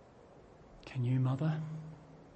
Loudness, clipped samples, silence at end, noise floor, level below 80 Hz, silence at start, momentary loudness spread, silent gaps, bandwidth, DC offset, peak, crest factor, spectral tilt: -36 LUFS; under 0.1%; 0.05 s; -58 dBFS; -66 dBFS; 0 s; 21 LU; none; 7.8 kHz; under 0.1%; -24 dBFS; 14 dB; -9 dB/octave